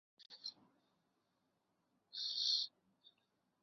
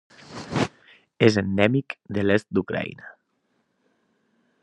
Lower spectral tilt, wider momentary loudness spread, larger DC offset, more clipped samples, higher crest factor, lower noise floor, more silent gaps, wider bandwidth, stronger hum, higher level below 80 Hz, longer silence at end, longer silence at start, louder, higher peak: second, 3 dB/octave vs -6.5 dB/octave; about the same, 16 LU vs 16 LU; neither; neither; about the same, 22 dB vs 24 dB; first, -84 dBFS vs -71 dBFS; neither; second, 7 kHz vs 10.5 kHz; neither; second, under -90 dBFS vs -62 dBFS; second, 0.95 s vs 1.5 s; about the same, 0.2 s vs 0.3 s; second, -40 LUFS vs -24 LUFS; second, -26 dBFS vs -2 dBFS